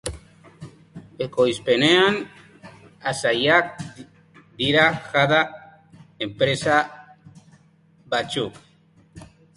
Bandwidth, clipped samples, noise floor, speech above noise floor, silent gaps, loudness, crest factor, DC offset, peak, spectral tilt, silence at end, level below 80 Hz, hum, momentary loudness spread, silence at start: 11.5 kHz; under 0.1%; -56 dBFS; 36 dB; none; -21 LUFS; 22 dB; under 0.1%; -2 dBFS; -4.5 dB/octave; 0.3 s; -54 dBFS; none; 15 LU; 0.05 s